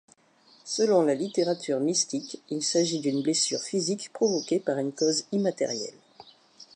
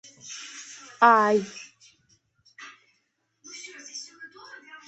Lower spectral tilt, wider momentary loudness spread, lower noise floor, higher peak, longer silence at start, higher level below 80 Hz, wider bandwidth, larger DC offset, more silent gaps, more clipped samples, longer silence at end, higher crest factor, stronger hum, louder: about the same, -3.5 dB/octave vs -3.5 dB/octave; second, 8 LU vs 27 LU; second, -60 dBFS vs -74 dBFS; second, -10 dBFS vs -4 dBFS; first, 0.65 s vs 0.3 s; second, -82 dBFS vs -76 dBFS; first, 11 kHz vs 8.4 kHz; neither; neither; neither; second, 0.1 s vs 0.6 s; second, 18 dB vs 24 dB; neither; second, -27 LUFS vs -20 LUFS